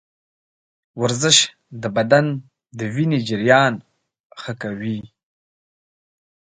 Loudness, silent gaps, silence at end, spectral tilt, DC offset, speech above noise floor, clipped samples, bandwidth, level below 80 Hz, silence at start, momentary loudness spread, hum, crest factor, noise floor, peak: -18 LUFS; 4.20-4.30 s; 1.45 s; -3.5 dB/octave; under 0.1%; over 71 dB; under 0.1%; 9.6 kHz; -62 dBFS; 0.95 s; 17 LU; none; 22 dB; under -90 dBFS; 0 dBFS